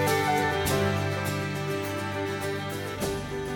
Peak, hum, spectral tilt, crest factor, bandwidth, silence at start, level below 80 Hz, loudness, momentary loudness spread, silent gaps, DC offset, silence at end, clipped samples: -12 dBFS; 50 Hz at -50 dBFS; -5 dB/octave; 16 dB; 19.5 kHz; 0 s; -50 dBFS; -28 LUFS; 7 LU; none; under 0.1%; 0 s; under 0.1%